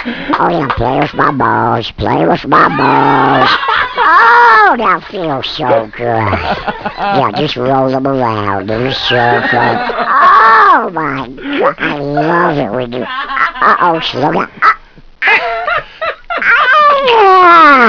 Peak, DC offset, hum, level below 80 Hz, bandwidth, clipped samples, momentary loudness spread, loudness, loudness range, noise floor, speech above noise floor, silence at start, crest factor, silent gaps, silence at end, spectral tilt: 0 dBFS; 0.3%; none; -38 dBFS; 5.4 kHz; 1%; 12 LU; -10 LUFS; 5 LU; -30 dBFS; 20 dB; 0 s; 10 dB; none; 0 s; -6.5 dB/octave